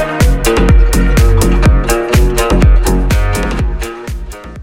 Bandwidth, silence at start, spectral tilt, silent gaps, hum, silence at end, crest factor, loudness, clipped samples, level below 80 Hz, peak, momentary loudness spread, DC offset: 16.5 kHz; 0 s; -5.5 dB/octave; none; none; 0 s; 10 dB; -12 LUFS; under 0.1%; -12 dBFS; 0 dBFS; 12 LU; under 0.1%